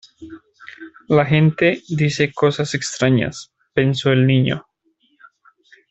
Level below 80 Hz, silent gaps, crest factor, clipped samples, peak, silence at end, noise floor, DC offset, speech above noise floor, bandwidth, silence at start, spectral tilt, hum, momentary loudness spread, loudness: -54 dBFS; none; 16 dB; under 0.1%; -2 dBFS; 1.3 s; -63 dBFS; under 0.1%; 46 dB; 8.2 kHz; 0.2 s; -6 dB/octave; none; 22 LU; -18 LUFS